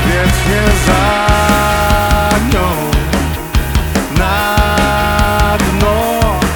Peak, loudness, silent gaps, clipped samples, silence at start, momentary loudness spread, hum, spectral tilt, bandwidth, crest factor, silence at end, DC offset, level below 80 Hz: 0 dBFS; -12 LUFS; none; under 0.1%; 0 s; 4 LU; none; -5 dB/octave; over 20 kHz; 12 dB; 0 s; under 0.1%; -18 dBFS